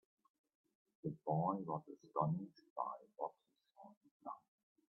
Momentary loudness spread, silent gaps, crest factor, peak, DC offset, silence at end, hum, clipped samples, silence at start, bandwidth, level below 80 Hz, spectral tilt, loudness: 21 LU; 2.70-2.76 s, 3.97-4.01 s, 4.11-4.20 s; 22 dB; -24 dBFS; under 0.1%; 0.55 s; none; under 0.1%; 1.05 s; 5.8 kHz; -86 dBFS; -11.5 dB/octave; -44 LUFS